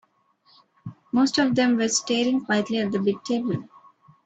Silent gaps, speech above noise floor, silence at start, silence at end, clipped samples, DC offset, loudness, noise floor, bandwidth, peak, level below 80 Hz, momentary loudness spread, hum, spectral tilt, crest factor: none; 40 dB; 0.85 s; 0.65 s; under 0.1%; under 0.1%; -23 LUFS; -62 dBFS; 9 kHz; -8 dBFS; -66 dBFS; 12 LU; none; -4 dB/octave; 16 dB